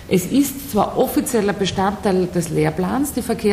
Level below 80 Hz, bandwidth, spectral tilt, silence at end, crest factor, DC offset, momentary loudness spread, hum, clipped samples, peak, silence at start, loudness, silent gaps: -42 dBFS; 16 kHz; -5.5 dB/octave; 0 s; 14 dB; under 0.1%; 3 LU; none; under 0.1%; -6 dBFS; 0 s; -19 LUFS; none